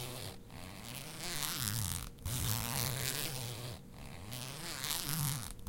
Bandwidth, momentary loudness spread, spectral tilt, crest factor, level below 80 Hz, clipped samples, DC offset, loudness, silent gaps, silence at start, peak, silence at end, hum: 17 kHz; 13 LU; -3 dB/octave; 24 dB; -54 dBFS; under 0.1%; under 0.1%; -38 LUFS; none; 0 s; -16 dBFS; 0 s; none